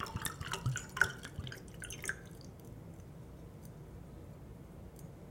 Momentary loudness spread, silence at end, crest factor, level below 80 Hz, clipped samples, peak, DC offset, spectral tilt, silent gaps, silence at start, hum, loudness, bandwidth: 18 LU; 0 s; 30 dB; -56 dBFS; under 0.1%; -12 dBFS; under 0.1%; -3.5 dB/octave; none; 0 s; none; -42 LUFS; 17 kHz